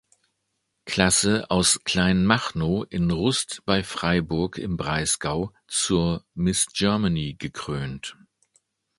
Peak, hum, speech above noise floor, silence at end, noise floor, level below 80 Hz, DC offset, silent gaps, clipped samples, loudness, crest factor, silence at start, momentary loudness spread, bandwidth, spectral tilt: 0 dBFS; none; 53 dB; 0.85 s; -76 dBFS; -44 dBFS; under 0.1%; none; under 0.1%; -23 LUFS; 24 dB; 0.85 s; 11 LU; 12 kHz; -4 dB/octave